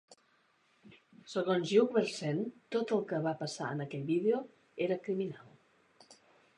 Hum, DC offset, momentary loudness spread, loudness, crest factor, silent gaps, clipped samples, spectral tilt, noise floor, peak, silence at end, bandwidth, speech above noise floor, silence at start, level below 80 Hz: none; under 0.1%; 10 LU; -34 LUFS; 20 dB; none; under 0.1%; -6 dB/octave; -71 dBFS; -14 dBFS; 0.45 s; 11 kHz; 38 dB; 0.1 s; -84 dBFS